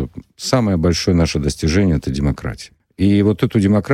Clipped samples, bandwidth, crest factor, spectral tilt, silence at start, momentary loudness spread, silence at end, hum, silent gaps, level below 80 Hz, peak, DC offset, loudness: under 0.1%; 13.5 kHz; 12 dB; -6 dB/octave; 0 s; 13 LU; 0 s; none; none; -30 dBFS; -4 dBFS; under 0.1%; -17 LUFS